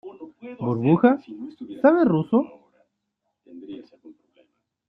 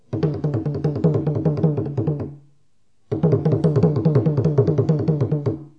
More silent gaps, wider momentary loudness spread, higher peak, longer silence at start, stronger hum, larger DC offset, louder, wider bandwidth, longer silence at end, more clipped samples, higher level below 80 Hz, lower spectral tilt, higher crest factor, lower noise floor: neither; first, 23 LU vs 6 LU; about the same, -4 dBFS vs -4 dBFS; about the same, 0.05 s vs 0.1 s; neither; second, under 0.1% vs 0.2%; about the same, -21 LUFS vs -20 LUFS; second, 5.2 kHz vs 5.8 kHz; first, 1.05 s vs 0.1 s; neither; second, -68 dBFS vs -52 dBFS; about the same, -11 dB/octave vs -11 dB/octave; about the same, 20 dB vs 16 dB; first, -78 dBFS vs -68 dBFS